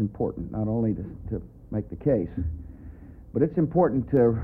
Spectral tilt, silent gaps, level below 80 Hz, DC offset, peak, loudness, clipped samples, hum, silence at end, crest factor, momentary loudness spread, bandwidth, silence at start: -13 dB/octave; none; -44 dBFS; under 0.1%; -8 dBFS; -27 LUFS; under 0.1%; none; 0 s; 18 dB; 18 LU; 2.9 kHz; 0 s